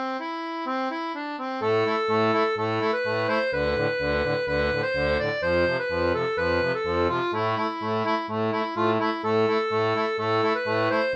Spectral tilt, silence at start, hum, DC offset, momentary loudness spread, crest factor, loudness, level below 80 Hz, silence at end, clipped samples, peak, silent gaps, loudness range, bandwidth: -6.5 dB/octave; 0 s; none; under 0.1%; 5 LU; 14 dB; -25 LUFS; -46 dBFS; 0 s; under 0.1%; -10 dBFS; none; 1 LU; 8 kHz